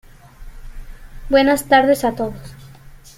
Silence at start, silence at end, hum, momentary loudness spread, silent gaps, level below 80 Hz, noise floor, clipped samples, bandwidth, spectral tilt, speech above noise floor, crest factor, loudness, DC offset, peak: 0.4 s; 0.2 s; none; 19 LU; none; -36 dBFS; -41 dBFS; under 0.1%; 16 kHz; -4.5 dB/octave; 26 dB; 18 dB; -16 LUFS; under 0.1%; -2 dBFS